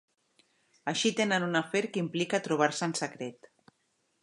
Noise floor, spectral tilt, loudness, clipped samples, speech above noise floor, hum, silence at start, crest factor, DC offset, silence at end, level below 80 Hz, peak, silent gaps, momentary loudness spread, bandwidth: -75 dBFS; -4 dB/octave; -30 LUFS; under 0.1%; 45 dB; none; 0.85 s; 22 dB; under 0.1%; 0.9 s; -80 dBFS; -10 dBFS; none; 10 LU; 11.5 kHz